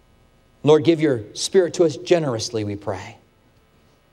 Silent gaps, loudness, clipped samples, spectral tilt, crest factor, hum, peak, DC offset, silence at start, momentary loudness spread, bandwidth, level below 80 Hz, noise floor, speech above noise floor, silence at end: none; -20 LUFS; under 0.1%; -5.5 dB/octave; 18 dB; none; -4 dBFS; under 0.1%; 0.65 s; 14 LU; 12.5 kHz; -60 dBFS; -57 dBFS; 38 dB; 1 s